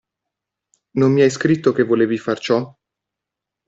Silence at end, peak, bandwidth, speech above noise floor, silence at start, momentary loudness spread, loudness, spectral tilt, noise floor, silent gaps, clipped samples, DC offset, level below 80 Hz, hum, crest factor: 1 s; -2 dBFS; 8 kHz; 68 dB; 0.95 s; 8 LU; -18 LUFS; -6.5 dB/octave; -84 dBFS; none; under 0.1%; under 0.1%; -60 dBFS; none; 16 dB